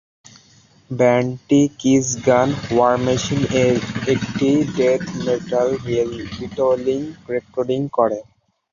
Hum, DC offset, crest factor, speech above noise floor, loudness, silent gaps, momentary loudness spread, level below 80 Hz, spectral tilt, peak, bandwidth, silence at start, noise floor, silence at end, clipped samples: none; under 0.1%; 16 dB; 34 dB; -19 LUFS; none; 9 LU; -48 dBFS; -5.5 dB/octave; -2 dBFS; 7.4 kHz; 0.9 s; -52 dBFS; 0.5 s; under 0.1%